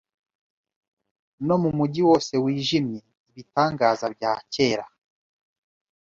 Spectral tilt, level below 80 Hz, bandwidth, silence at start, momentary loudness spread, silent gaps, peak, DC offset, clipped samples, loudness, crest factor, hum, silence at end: -6 dB/octave; -60 dBFS; 7.8 kHz; 1.4 s; 11 LU; 3.20-3.26 s; -6 dBFS; under 0.1%; under 0.1%; -23 LUFS; 20 dB; none; 1.2 s